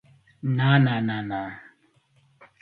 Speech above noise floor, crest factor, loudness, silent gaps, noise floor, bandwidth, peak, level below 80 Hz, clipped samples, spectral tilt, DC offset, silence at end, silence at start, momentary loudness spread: 41 dB; 20 dB; -24 LUFS; none; -63 dBFS; 4.6 kHz; -6 dBFS; -64 dBFS; under 0.1%; -9.5 dB/octave; under 0.1%; 1 s; 0.45 s; 16 LU